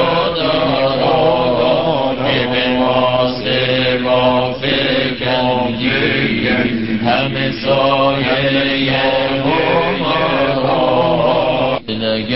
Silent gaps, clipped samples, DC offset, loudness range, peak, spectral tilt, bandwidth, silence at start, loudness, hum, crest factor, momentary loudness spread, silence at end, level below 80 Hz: none; under 0.1%; 1%; 1 LU; -2 dBFS; -10 dB/octave; 5.8 kHz; 0 s; -14 LUFS; none; 12 dB; 3 LU; 0 s; -42 dBFS